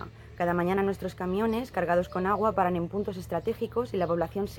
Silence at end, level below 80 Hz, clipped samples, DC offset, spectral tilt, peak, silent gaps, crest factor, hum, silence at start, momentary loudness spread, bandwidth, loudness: 0 s; -52 dBFS; under 0.1%; under 0.1%; -7.5 dB/octave; -12 dBFS; none; 18 dB; none; 0 s; 6 LU; 17.5 kHz; -29 LUFS